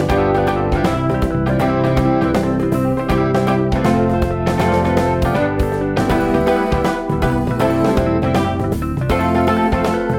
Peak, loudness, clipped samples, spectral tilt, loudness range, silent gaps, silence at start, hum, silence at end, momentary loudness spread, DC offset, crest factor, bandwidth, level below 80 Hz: -2 dBFS; -17 LUFS; under 0.1%; -7.5 dB/octave; 1 LU; none; 0 s; none; 0 s; 3 LU; under 0.1%; 14 dB; 16.5 kHz; -28 dBFS